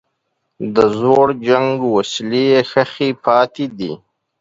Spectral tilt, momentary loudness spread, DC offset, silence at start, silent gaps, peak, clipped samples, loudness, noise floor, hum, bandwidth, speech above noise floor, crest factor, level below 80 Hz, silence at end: -5.5 dB/octave; 12 LU; under 0.1%; 0.6 s; none; 0 dBFS; under 0.1%; -15 LUFS; -71 dBFS; none; 7.8 kHz; 56 dB; 16 dB; -56 dBFS; 0.45 s